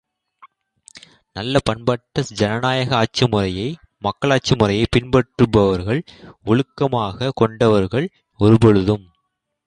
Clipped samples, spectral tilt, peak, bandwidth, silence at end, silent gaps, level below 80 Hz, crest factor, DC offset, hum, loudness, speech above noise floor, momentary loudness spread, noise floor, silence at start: under 0.1%; -6.5 dB/octave; -2 dBFS; 10.5 kHz; 0.65 s; none; -40 dBFS; 18 dB; under 0.1%; none; -18 LUFS; 56 dB; 10 LU; -74 dBFS; 0.95 s